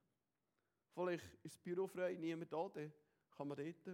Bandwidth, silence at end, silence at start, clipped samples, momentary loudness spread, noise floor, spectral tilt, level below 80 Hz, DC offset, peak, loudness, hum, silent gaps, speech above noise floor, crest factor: 16.5 kHz; 0 s; 0.95 s; under 0.1%; 12 LU; -90 dBFS; -6.5 dB/octave; -88 dBFS; under 0.1%; -32 dBFS; -47 LUFS; none; none; 44 dB; 16 dB